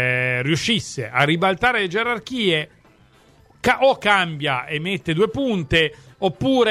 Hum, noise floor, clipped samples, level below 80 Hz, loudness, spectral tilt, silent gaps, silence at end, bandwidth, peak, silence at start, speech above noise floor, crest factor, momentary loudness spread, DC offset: none; -53 dBFS; under 0.1%; -48 dBFS; -20 LUFS; -5 dB/octave; none; 0 s; 15 kHz; -2 dBFS; 0 s; 33 dB; 20 dB; 7 LU; under 0.1%